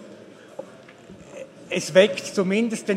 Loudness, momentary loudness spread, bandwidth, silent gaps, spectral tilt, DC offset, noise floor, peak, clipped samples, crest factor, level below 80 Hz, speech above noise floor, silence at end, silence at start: -21 LUFS; 24 LU; 14 kHz; none; -4.5 dB/octave; under 0.1%; -45 dBFS; -2 dBFS; under 0.1%; 22 dB; -68 dBFS; 25 dB; 0 s; 0 s